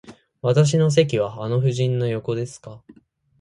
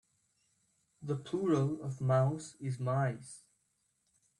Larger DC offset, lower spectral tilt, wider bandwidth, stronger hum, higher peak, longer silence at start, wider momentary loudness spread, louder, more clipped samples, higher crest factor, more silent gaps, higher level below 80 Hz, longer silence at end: neither; about the same, -6.5 dB/octave vs -7.5 dB/octave; about the same, 11 kHz vs 11 kHz; neither; first, -2 dBFS vs -18 dBFS; second, 0.05 s vs 1 s; second, 11 LU vs 17 LU; first, -21 LUFS vs -34 LUFS; neither; about the same, 18 dB vs 18 dB; neither; first, -58 dBFS vs -74 dBFS; second, 0.65 s vs 1 s